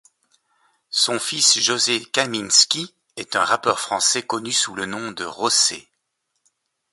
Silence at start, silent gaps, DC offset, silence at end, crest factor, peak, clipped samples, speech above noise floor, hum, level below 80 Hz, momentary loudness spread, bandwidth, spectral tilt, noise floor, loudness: 0.9 s; none; under 0.1%; 1.1 s; 22 dB; 0 dBFS; under 0.1%; 54 dB; none; -66 dBFS; 13 LU; 12 kHz; -0.5 dB/octave; -75 dBFS; -19 LUFS